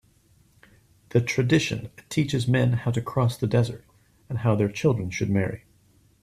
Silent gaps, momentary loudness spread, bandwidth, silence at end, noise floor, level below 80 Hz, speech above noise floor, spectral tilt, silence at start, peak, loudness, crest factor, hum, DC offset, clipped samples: none; 8 LU; 13.5 kHz; 0.65 s; -60 dBFS; -54 dBFS; 37 dB; -6.5 dB/octave; 1.15 s; -6 dBFS; -25 LUFS; 18 dB; none; under 0.1%; under 0.1%